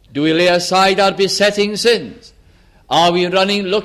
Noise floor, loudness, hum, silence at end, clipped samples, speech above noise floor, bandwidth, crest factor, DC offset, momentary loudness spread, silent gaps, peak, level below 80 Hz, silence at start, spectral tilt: -48 dBFS; -14 LUFS; none; 0 s; under 0.1%; 34 dB; 15 kHz; 14 dB; under 0.1%; 4 LU; none; -2 dBFS; -50 dBFS; 0.15 s; -4 dB/octave